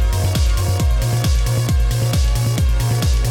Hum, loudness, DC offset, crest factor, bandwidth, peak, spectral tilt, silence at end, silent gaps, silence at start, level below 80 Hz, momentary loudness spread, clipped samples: none; -18 LUFS; under 0.1%; 8 dB; 17.5 kHz; -6 dBFS; -5 dB/octave; 0 s; none; 0 s; -18 dBFS; 0 LU; under 0.1%